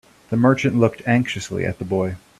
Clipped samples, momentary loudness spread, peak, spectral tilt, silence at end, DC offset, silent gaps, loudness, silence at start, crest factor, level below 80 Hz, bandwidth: under 0.1%; 8 LU; -2 dBFS; -6.5 dB/octave; 0.2 s; under 0.1%; none; -20 LUFS; 0.3 s; 18 dB; -54 dBFS; 12.5 kHz